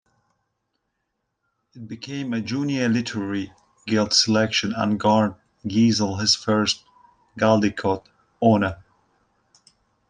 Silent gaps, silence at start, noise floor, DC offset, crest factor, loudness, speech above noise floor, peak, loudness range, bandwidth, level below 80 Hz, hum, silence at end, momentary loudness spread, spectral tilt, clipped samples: none; 1.75 s; -77 dBFS; under 0.1%; 20 dB; -22 LUFS; 56 dB; -4 dBFS; 8 LU; 9.8 kHz; -60 dBFS; none; 1.3 s; 12 LU; -4.5 dB/octave; under 0.1%